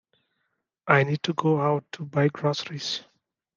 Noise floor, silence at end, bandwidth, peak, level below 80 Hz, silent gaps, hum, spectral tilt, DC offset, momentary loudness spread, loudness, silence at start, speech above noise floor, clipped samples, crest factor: -78 dBFS; 0.55 s; 7.4 kHz; -2 dBFS; -74 dBFS; none; none; -6 dB/octave; under 0.1%; 9 LU; -25 LUFS; 0.85 s; 53 dB; under 0.1%; 24 dB